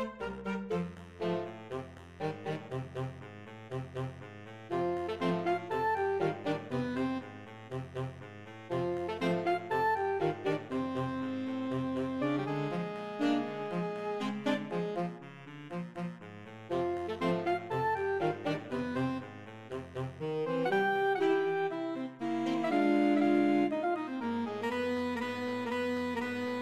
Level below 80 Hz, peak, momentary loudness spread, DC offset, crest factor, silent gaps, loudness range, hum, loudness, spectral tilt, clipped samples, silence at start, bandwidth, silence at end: -66 dBFS; -18 dBFS; 13 LU; under 0.1%; 16 dB; none; 7 LU; none; -34 LUFS; -7 dB/octave; under 0.1%; 0 s; 14 kHz; 0 s